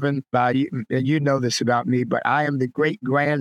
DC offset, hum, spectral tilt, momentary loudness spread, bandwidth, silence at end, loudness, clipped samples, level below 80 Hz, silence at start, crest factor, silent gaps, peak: under 0.1%; none; -6 dB/octave; 3 LU; 13.5 kHz; 0 s; -21 LUFS; under 0.1%; -70 dBFS; 0 s; 16 dB; none; -6 dBFS